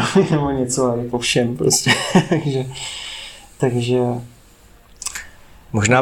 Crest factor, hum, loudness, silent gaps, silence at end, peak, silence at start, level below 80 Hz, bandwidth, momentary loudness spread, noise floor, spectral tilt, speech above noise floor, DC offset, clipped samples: 18 dB; none; -19 LUFS; none; 0 s; -2 dBFS; 0 s; -46 dBFS; 17 kHz; 14 LU; -47 dBFS; -4.5 dB/octave; 30 dB; under 0.1%; under 0.1%